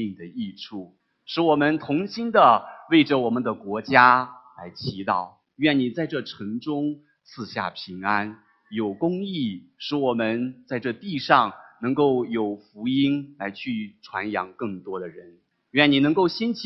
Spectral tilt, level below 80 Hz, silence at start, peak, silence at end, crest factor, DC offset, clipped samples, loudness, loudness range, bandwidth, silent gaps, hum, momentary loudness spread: -7 dB/octave; -64 dBFS; 0 s; 0 dBFS; 0 s; 24 dB; under 0.1%; under 0.1%; -23 LUFS; 8 LU; 6 kHz; none; none; 16 LU